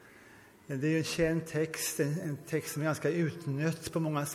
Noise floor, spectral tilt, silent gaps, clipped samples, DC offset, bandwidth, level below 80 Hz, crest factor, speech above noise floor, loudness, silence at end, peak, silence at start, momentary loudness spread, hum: -56 dBFS; -5.5 dB/octave; none; under 0.1%; under 0.1%; 16 kHz; -62 dBFS; 16 dB; 24 dB; -33 LUFS; 0 s; -16 dBFS; 0 s; 5 LU; none